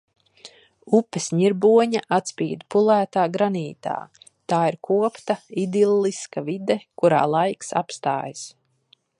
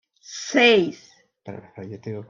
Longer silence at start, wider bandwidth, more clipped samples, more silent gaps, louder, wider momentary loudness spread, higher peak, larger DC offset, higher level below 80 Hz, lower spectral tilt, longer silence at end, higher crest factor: first, 0.45 s vs 0.3 s; first, 11 kHz vs 7.6 kHz; neither; neither; second, -22 LUFS vs -18 LUFS; second, 11 LU vs 24 LU; about the same, -4 dBFS vs -4 dBFS; neither; about the same, -72 dBFS vs -68 dBFS; first, -5.5 dB/octave vs -3.5 dB/octave; first, 0.7 s vs 0.05 s; about the same, 18 dB vs 18 dB